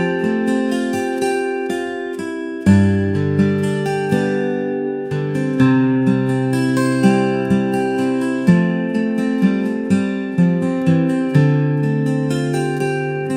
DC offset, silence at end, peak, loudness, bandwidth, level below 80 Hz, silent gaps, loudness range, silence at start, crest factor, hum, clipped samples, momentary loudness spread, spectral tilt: 0.1%; 0 s; -2 dBFS; -18 LUFS; 15 kHz; -54 dBFS; none; 2 LU; 0 s; 16 dB; none; under 0.1%; 7 LU; -7.5 dB/octave